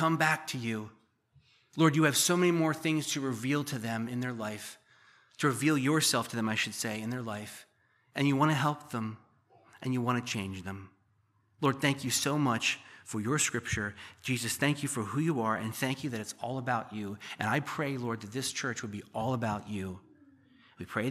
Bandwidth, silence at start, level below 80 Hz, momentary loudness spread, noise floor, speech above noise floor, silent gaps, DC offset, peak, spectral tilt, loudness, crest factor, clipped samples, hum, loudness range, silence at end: 15 kHz; 0 s; -66 dBFS; 14 LU; -71 dBFS; 40 dB; none; under 0.1%; -12 dBFS; -4 dB/octave; -31 LUFS; 22 dB; under 0.1%; none; 5 LU; 0 s